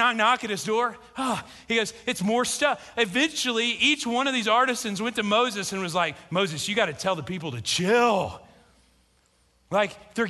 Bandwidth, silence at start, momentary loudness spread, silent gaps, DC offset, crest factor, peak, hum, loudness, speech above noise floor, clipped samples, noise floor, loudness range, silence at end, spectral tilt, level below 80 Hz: 12.5 kHz; 0 s; 8 LU; none; under 0.1%; 20 dB; -6 dBFS; none; -25 LUFS; 39 dB; under 0.1%; -64 dBFS; 3 LU; 0 s; -3 dB/octave; -60 dBFS